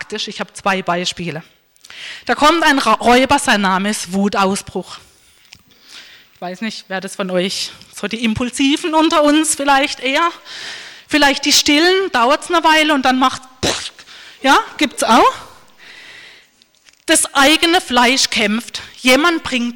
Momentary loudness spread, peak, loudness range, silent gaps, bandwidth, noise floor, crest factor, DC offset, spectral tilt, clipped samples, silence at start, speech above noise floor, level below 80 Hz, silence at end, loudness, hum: 16 LU; -4 dBFS; 9 LU; none; 19 kHz; -51 dBFS; 12 dB; under 0.1%; -2.5 dB/octave; under 0.1%; 0 s; 36 dB; -46 dBFS; 0 s; -14 LUFS; none